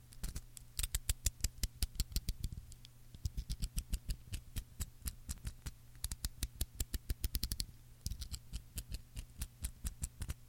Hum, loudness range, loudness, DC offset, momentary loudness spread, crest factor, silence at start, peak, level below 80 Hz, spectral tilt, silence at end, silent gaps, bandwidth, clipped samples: none; 4 LU; -44 LUFS; under 0.1%; 10 LU; 28 dB; 0 s; -14 dBFS; -44 dBFS; -2.5 dB/octave; 0 s; none; 17 kHz; under 0.1%